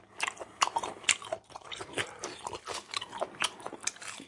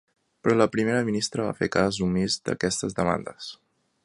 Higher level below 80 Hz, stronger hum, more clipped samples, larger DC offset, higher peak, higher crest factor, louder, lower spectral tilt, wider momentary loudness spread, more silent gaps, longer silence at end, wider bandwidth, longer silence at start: second, -70 dBFS vs -52 dBFS; neither; neither; neither; about the same, -6 dBFS vs -4 dBFS; first, 30 dB vs 22 dB; second, -34 LUFS vs -25 LUFS; second, -0.5 dB/octave vs -4.5 dB/octave; first, 12 LU vs 8 LU; neither; second, 0 s vs 0.5 s; about the same, 11.5 kHz vs 11.5 kHz; second, 0 s vs 0.45 s